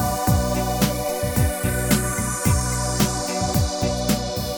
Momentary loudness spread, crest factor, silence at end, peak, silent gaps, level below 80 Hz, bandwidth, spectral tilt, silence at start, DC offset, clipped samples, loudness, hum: 3 LU; 16 dB; 0 s; -4 dBFS; none; -30 dBFS; over 20 kHz; -4.5 dB/octave; 0 s; 0.2%; under 0.1%; -22 LUFS; none